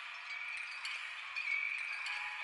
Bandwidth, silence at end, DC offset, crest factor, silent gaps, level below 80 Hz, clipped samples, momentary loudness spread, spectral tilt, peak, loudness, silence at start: 11.5 kHz; 0 s; under 0.1%; 14 dB; none; -88 dBFS; under 0.1%; 6 LU; 3.5 dB/octave; -26 dBFS; -39 LUFS; 0 s